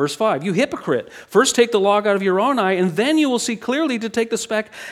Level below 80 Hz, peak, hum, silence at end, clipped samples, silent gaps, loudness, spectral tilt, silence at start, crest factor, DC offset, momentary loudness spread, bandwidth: -64 dBFS; -2 dBFS; none; 0 s; under 0.1%; none; -19 LUFS; -4 dB/octave; 0 s; 16 dB; under 0.1%; 7 LU; 16 kHz